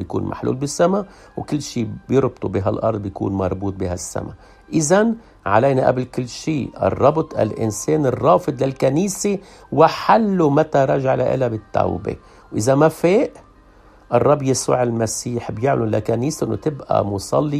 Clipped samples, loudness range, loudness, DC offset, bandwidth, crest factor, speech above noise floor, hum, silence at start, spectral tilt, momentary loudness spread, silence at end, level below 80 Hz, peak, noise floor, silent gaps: under 0.1%; 4 LU; -19 LUFS; under 0.1%; 14 kHz; 18 dB; 29 dB; none; 0 s; -6 dB/octave; 10 LU; 0 s; -48 dBFS; 0 dBFS; -48 dBFS; none